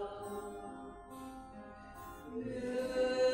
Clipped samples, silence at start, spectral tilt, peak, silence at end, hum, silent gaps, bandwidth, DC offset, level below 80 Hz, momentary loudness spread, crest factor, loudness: under 0.1%; 0 s; -4.5 dB/octave; -22 dBFS; 0 s; none; none; 16 kHz; under 0.1%; -62 dBFS; 16 LU; 18 dB; -41 LUFS